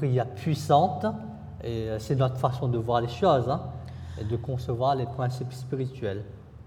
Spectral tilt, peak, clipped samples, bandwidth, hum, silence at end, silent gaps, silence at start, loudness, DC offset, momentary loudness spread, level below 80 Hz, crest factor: -7.5 dB/octave; -6 dBFS; under 0.1%; 13.5 kHz; none; 0 s; none; 0 s; -28 LUFS; under 0.1%; 15 LU; -52 dBFS; 20 dB